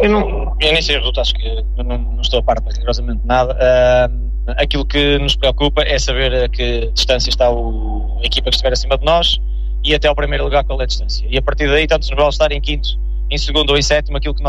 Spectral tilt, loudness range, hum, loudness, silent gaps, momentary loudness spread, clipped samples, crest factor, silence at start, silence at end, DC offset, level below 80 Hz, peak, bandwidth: -4.5 dB/octave; 2 LU; none; -15 LUFS; none; 8 LU; under 0.1%; 12 dB; 0 s; 0 s; under 0.1%; -18 dBFS; -2 dBFS; 8 kHz